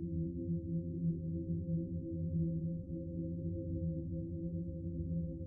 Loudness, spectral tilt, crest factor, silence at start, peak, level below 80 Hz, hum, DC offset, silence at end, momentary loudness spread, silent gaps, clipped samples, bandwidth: -40 LUFS; -19.5 dB/octave; 12 dB; 0 s; -26 dBFS; -54 dBFS; none; under 0.1%; 0 s; 4 LU; none; under 0.1%; 0.8 kHz